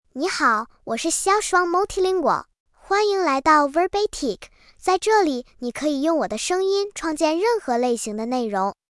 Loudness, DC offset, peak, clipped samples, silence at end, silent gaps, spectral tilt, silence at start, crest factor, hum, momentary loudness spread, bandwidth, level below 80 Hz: -21 LUFS; under 0.1%; -6 dBFS; under 0.1%; 0.2 s; 2.60-2.66 s; -2.5 dB/octave; 0.15 s; 16 dB; none; 8 LU; 12 kHz; -52 dBFS